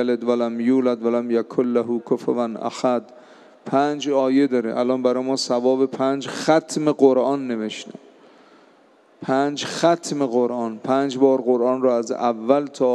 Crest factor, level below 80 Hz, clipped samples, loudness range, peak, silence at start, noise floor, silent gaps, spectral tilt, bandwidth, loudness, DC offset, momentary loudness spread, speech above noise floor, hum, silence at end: 18 dB; -80 dBFS; under 0.1%; 3 LU; -2 dBFS; 0 s; -54 dBFS; none; -5 dB/octave; 11.5 kHz; -21 LUFS; under 0.1%; 6 LU; 34 dB; none; 0 s